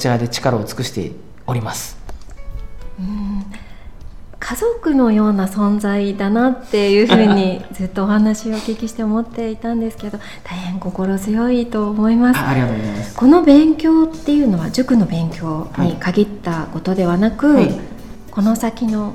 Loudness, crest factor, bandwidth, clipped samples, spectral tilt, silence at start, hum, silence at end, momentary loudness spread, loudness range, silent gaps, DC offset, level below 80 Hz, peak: -16 LUFS; 16 dB; 15 kHz; under 0.1%; -6.5 dB/octave; 0 s; none; 0 s; 16 LU; 10 LU; none; 2%; -36 dBFS; 0 dBFS